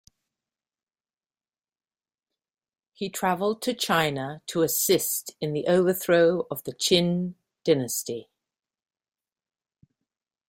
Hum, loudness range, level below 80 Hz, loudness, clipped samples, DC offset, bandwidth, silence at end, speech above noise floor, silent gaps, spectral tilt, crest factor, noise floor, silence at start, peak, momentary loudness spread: none; 9 LU; -66 dBFS; -25 LUFS; under 0.1%; under 0.1%; 16.5 kHz; 2.25 s; over 65 dB; none; -4 dB/octave; 20 dB; under -90 dBFS; 3 s; -8 dBFS; 12 LU